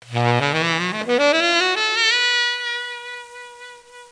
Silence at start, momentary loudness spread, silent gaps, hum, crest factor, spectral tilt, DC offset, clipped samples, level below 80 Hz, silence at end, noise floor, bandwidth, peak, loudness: 0.05 s; 18 LU; none; none; 18 dB; -3.5 dB/octave; under 0.1%; under 0.1%; -70 dBFS; 0.05 s; -41 dBFS; 10.5 kHz; -2 dBFS; -18 LUFS